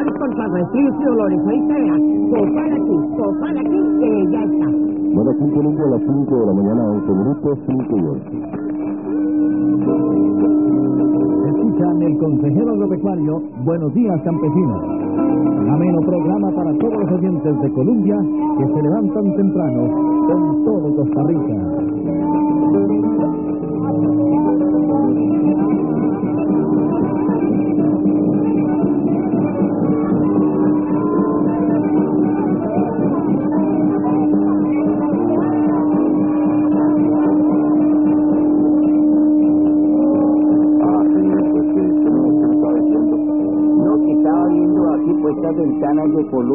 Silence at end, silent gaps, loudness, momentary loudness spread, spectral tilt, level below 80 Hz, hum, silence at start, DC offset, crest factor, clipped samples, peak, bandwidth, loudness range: 0 s; none; -16 LUFS; 4 LU; -15 dB/octave; -50 dBFS; none; 0 s; 0.3%; 12 dB; under 0.1%; -4 dBFS; 2.9 kHz; 3 LU